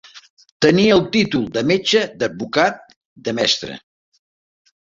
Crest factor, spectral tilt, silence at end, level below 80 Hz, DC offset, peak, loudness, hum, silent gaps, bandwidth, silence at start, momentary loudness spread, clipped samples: 18 dB; -4.5 dB/octave; 1.1 s; -54 dBFS; under 0.1%; -2 dBFS; -17 LUFS; none; 0.30-0.37 s, 0.52-0.60 s, 2.96-3.16 s; 7.8 kHz; 0.15 s; 14 LU; under 0.1%